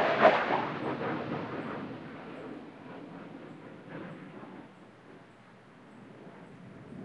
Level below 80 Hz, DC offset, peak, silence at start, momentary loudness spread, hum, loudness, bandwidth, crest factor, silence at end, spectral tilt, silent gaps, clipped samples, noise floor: -74 dBFS; under 0.1%; -8 dBFS; 0 s; 24 LU; none; -32 LUFS; 8.8 kHz; 26 dB; 0 s; -6.5 dB/octave; none; under 0.1%; -55 dBFS